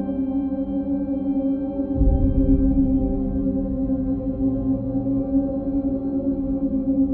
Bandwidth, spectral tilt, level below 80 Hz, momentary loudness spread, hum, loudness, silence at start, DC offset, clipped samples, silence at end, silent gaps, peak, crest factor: 2.3 kHz; -14.5 dB/octave; -28 dBFS; 5 LU; none; -23 LUFS; 0 s; under 0.1%; under 0.1%; 0 s; none; -8 dBFS; 14 dB